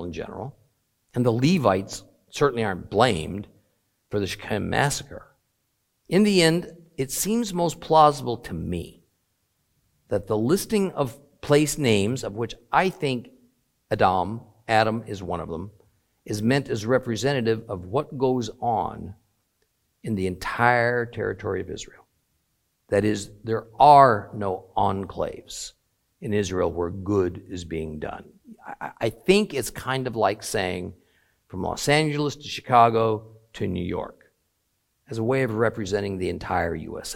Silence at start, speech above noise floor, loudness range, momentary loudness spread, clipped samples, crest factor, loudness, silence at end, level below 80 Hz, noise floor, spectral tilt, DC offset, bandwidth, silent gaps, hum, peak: 0 s; 50 dB; 6 LU; 16 LU; under 0.1%; 24 dB; -24 LUFS; 0 s; -52 dBFS; -73 dBFS; -5 dB/octave; under 0.1%; 16.5 kHz; none; none; -2 dBFS